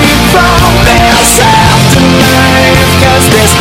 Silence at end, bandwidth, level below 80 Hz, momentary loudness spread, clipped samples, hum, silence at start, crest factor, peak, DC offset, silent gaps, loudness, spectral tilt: 0 s; over 20 kHz; -16 dBFS; 1 LU; 4%; none; 0 s; 4 dB; 0 dBFS; under 0.1%; none; -4 LUFS; -4 dB/octave